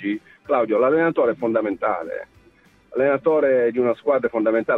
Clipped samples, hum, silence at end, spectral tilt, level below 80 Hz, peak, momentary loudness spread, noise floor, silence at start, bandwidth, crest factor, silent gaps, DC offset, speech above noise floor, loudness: under 0.1%; none; 0 s; -8.5 dB/octave; -62 dBFS; -6 dBFS; 10 LU; -55 dBFS; 0 s; 4.2 kHz; 14 dB; none; under 0.1%; 35 dB; -20 LUFS